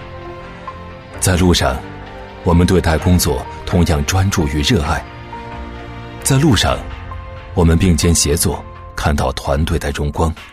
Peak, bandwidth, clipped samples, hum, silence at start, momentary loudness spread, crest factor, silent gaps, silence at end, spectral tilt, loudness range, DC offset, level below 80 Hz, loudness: -2 dBFS; 15.5 kHz; under 0.1%; none; 0 s; 18 LU; 14 dB; none; 0 s; -5 dB/octave; 2 LU; under 0.1%; -26 dBFS; -15 LUFS